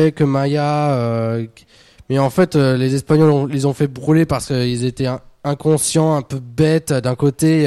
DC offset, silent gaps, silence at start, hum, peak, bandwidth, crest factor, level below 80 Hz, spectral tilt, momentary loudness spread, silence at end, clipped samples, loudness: under 0.1%; none; 0 s; none; -2 dBFS; 13 kHz; 14 dB; -46 dBFS; -6.5 dB/octave; 8 LU; 0 s; under 0.1%; -17 LUFS